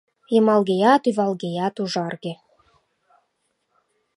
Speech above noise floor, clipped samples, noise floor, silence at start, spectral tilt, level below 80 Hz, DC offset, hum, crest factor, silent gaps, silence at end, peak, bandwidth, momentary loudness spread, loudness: 52 dB; under 0.1%; -72 dBFS; 0.3 s; -6 dB/octave; -74 dBFS; under 0.1%; none; 20 dB; none; 1.8 s; -4 dBFS; 11.5 kHz; 15 LU; -21 LUFS